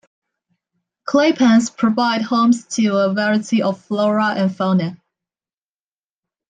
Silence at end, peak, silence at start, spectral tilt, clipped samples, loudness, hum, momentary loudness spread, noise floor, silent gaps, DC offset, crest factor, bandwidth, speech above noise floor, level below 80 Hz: 1.55 s; -4 dBFS; 1.05 s; -5.5 dB/octave; under 0.1%; -17 LUFS; none; 6 LU; under -90 dBFS; none; under 0.1%; 14 dB; 9.6 kHz; over 74 dB; -64 dBFS